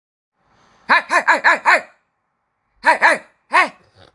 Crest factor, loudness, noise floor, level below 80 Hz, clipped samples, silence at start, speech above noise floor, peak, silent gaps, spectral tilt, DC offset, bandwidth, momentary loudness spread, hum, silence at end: 18 dB; -15 LUFS; -71 dBFS; -70 dBFS; under 0.1%; 0.9 s; 56 dB; 0 dBFS; none; -1 dB/octave; under 0.1%; 11.5 kHz; 6 LU; none; 0.45 s